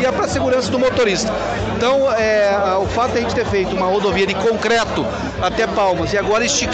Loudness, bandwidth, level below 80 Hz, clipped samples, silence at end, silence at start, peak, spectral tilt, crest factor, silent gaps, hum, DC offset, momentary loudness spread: -17 LUFS; 8.8 kHz; -36 dBFS; under 0.1%; 0 s; 0 s; -4 dBFS; -4 dB/octave; 12 dB; none; none; under 0.1%; 5 LU